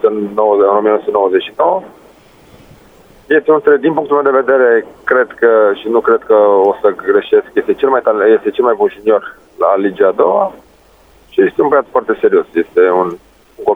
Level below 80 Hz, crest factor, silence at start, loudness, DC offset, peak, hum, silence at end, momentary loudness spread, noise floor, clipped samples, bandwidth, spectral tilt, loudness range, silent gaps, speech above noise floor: -54 dBFS; 12 dB; 0.05 s; -12 LUFS; under 0.1%; 0 dBFS; none; 0 s; 6 LU; -46 dBFS; under 0.1%; 3.9 kHz; -7 dB/octave; 3 LU; none; 34 dB